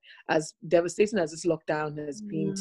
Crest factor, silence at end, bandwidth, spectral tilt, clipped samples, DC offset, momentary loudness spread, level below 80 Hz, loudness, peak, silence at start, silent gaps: 18 dB; 0 s; 12 kHz; -5 dB/octave; under 0.1%; under 0.1%; 8 LU; -64 dBFS; -28 LUFS; -10 dBFS; 0.1 s; none